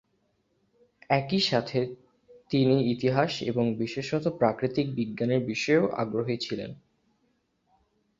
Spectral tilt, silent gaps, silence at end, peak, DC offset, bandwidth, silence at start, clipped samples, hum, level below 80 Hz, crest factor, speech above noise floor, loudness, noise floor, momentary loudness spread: -6 dB/octave; none; 1.45 s; -8 dBFS; under 0.1%; 7.8 kHz; 1.1 s; under 0.1%; none; -64 dBFS; 20 dB; 46 dB; -27 LUFS; -72 dBFS; 7 LU